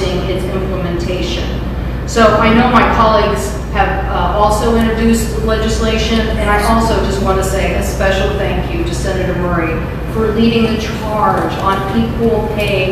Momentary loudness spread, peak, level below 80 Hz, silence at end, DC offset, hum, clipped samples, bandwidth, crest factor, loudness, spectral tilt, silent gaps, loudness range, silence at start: 8 LU; 0 dBFS; -22 dBFS; 0 s; under 0.1%; none; under 0.1%; 15 kHz; 14 dB; -14 LUFS; -5.5 dB/octave; none; 3 LU; 0 s